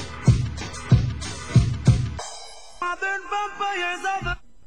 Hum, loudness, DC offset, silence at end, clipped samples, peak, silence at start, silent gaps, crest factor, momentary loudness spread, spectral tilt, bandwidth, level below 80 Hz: none; -24 LUFS; 0.7%; 0.3 s; under 0.1%; -4 dBFS; 0 s; none; 18 dB; 12 LU; -5.5 dB/octave; 10.5 kHz; -34 dBFS